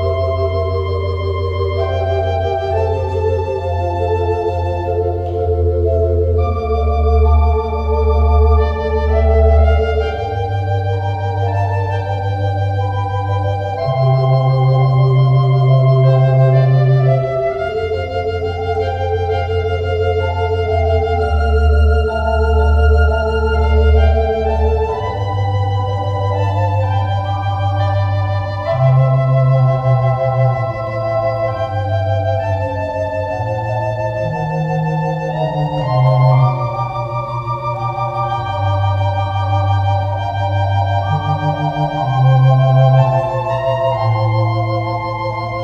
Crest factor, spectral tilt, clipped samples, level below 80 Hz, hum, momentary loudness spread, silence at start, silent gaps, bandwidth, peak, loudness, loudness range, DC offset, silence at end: 14 dB; -8.5 dB/octave; under 0.1%; -22 dBFS; none; 7 LU; 0 s; none; 6.6 kHz; 0 dBFS; -16 LUFS; 5 LU; under 0.1%; 0 s